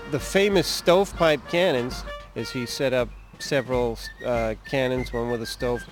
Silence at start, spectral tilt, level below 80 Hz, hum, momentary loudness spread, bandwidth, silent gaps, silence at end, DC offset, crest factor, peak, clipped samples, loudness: 0 s; -4.5 dB/octave; -42 dBFS; none; 12 LU; 17 kHz; none; 0 s; under 0.1%; 18 dB; -6 dBFS; under 0.1%; -24 LUFS